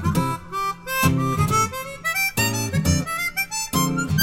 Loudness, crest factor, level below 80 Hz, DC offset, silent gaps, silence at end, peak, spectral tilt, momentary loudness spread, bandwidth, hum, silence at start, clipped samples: -22 LUFS; 16 dB; -40 dBFS; under 0.1%; none; 0 s; -6 dBFS; -4 dB/octave; 6 LU; 17 kHz; none; 0 s; under 0.1%